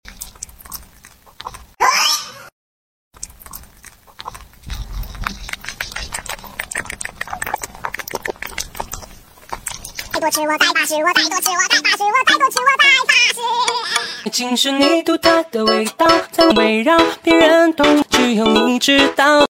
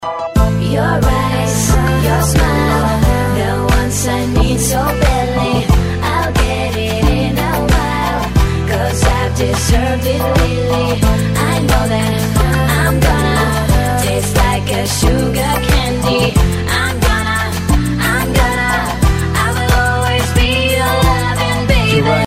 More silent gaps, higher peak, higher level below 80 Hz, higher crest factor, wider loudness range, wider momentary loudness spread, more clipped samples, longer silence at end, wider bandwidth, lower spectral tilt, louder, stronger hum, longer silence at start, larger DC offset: first, 2.52-3.11 s vs none; about the same, 0 dBFS vs 0 dBFS; second, -40 dBFS vs -18 dBFS; first, 18 dB vs 12 dB; first, 15 LU vs 1 LU; first, 21 LU vs 3 LU; neither; about the same, 0.05 s vs 0 s; about the same, 17 kHz vs 16.5 kHz; second, -2 dB/octave vs -5 dB/octave; about the same, -14 LUFS vs -14 LUFS; neither; about the same, 0.1 s vs 0 s; neither